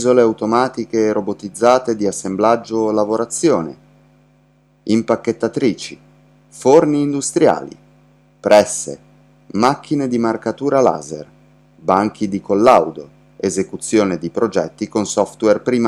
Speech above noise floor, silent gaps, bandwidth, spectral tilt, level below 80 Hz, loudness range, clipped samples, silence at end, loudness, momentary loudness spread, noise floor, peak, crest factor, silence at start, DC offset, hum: 39 dB; none; 13.5 kHz; -5 dB/octave; -56 dBFS; 3 LU; under 0.1%; 0 s; -17 LUFS; 13 LU; -54 dBFS; 0 dBFS; 16 dB; 0 s; under 0.1%; none